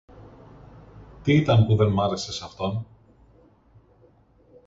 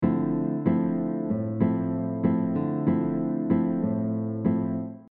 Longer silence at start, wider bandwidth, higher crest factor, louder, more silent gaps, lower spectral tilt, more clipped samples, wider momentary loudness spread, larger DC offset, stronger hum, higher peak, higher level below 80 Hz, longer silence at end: first, 0.2 s vs 0 s; first, 7.8 kHz vs 3.5 kHz; first, 20 dB vs 14 dB; first, -23 LUFS vs -26 LUFS; neither; second, -7 dB/octave vs -11 dB/octave; neither; first, 14 LU vs 4 LU; neither; neither; first, -6 dBFS vs -10 dBFS; first, -48 dBFS vs -62 dBFS; first, 1.8 s vs 0.05 s